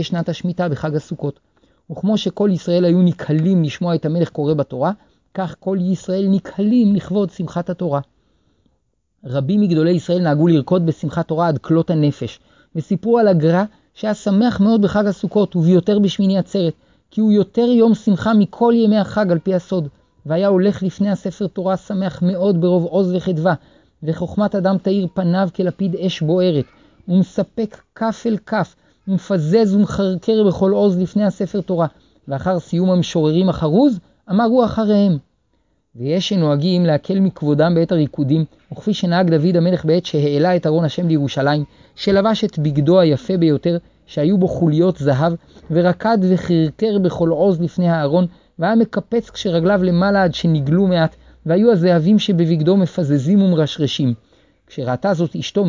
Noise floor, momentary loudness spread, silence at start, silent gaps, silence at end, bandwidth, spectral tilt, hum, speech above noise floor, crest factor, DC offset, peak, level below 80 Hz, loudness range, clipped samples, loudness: -67 dBFS; 9 LU; 0 s; none; 0 s; 7.6 kHz; -8 dB/octave; none; 51 dB; 14 dB; under 0.1%; -2 dBFS; -50 dBFS; 4 LU; under 0.1%; -17 LUFS